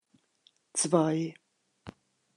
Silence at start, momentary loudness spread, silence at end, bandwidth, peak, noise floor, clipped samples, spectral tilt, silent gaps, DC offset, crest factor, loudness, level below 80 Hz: 0.75 s; 25 LU; 0.45 s; 11.5 kHz; -10 dBFS; -68 dBFS; under 0.1%; -5 dB/octave; none; under 0.1%; 24 dB; -29 LUFS; -74 dBFS